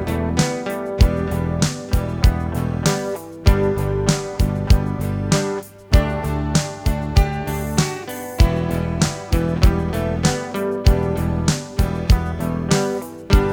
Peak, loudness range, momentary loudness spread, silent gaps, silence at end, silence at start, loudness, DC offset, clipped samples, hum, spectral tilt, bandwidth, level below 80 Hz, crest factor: -2 dBFS; 1 LU; 6 LU; none; 0 s; 0 s; -20 LUFS; under 0.1%; under 0.1%; none; -5.5 dB/octave; 20 kHz; -22 dBFS; 18 dB